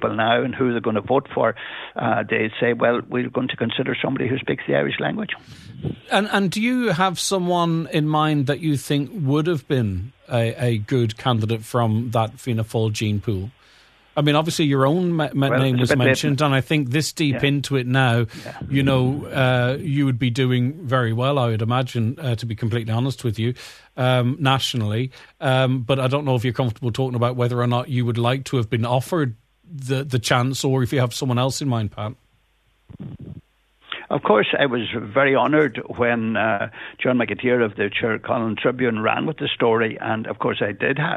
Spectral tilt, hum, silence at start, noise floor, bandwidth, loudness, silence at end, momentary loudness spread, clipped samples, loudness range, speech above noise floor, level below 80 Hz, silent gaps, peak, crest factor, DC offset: -6 dB/octave; none; 0 s; -62 dBFS; 14 kHz; -21 LUFS; 0 s; 7 LU; under 0.1%; 3 LU; 42 dB; -54 dBFS; none; -2 dBFS; 20 dB; under 0.1%